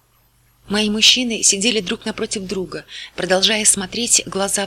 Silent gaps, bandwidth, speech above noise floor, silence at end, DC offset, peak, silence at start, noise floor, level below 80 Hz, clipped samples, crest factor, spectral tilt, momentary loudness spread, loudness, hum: none; 19 kHz; 39 dB; 0 s; under 0.1%; 0 dBFS; 0.65 s; -57 dBFS; -50 dBFS; under 0.1%; 18 dB; -1.5 dB/octave; 15 LU; -16 LUFS; none